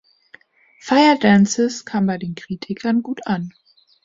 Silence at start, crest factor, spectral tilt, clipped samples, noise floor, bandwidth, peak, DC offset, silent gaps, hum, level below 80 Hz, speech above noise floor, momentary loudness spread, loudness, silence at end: 0.85 s; 18 dB; -5 dB/octave; under 0.1%; -51 dBFS; 7.8 kHz; -2 dBFS; under 0.1%; none; none; -58 dBFS; 34 dB; 15 LU; -18 LUFS; 0.55 s